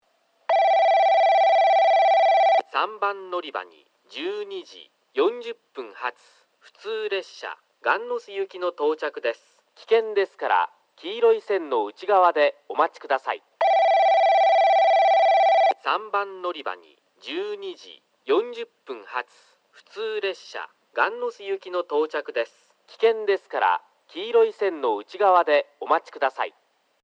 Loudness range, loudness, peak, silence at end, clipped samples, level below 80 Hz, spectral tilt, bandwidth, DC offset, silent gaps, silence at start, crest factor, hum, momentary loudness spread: 11 LU; -22 LUFS; -6 dBFS; 0.55 s; under 0.1%; under -90 dBFS; -2.5 dB/octave; 7.6 kHz; under 0.1%; none; 0.5 s; 18 dB; none; 18 LU